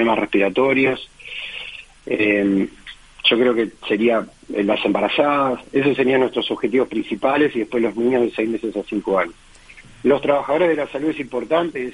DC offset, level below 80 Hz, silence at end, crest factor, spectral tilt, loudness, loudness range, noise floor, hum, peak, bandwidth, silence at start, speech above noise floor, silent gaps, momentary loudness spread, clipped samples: under 0.1%; -52 dBFS; 0 s; 18 dB; -6 dB/octave; -19 LUFS; 2 LU; -44 dBFS; none; -2 dBFS; 11 kHz; 0 s; 26 dB; none; 11 LU; under 0.1%